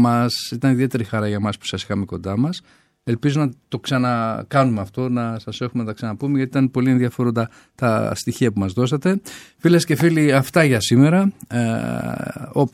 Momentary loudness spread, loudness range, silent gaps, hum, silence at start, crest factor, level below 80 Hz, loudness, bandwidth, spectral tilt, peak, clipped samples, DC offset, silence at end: 10 LU; 5 LU; none; none; 0 s; 16 dB; -56 dBFS; -20 LUFS; 16 kHz; -6.5 dB/octave; -2 dBFS; under 0.1%; under 0.1%; 0.05 s